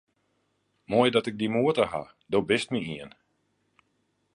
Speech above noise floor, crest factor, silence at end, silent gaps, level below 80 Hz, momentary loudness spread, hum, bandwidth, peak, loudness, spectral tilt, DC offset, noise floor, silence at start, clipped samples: 47 dB; 22 dB; 1.25 s; none; -64 dBFS; 14 LU; none; 11 kHz; -8 dBFS; -26 LUFS; -5.5 dB/octave; under 0.1%; -73 dBFS; 0.9 s; under 0.1%